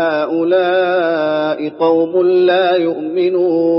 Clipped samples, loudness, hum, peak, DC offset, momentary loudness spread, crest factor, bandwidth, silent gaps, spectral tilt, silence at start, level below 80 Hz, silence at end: under 0.1%; -14 LUFS; none; -2 dBFS; under 0.1%; 5 LU; 12 dB; 5.8 kHz; none; -3.5 dB/octave; 0 s; -72 dBFS; 0 s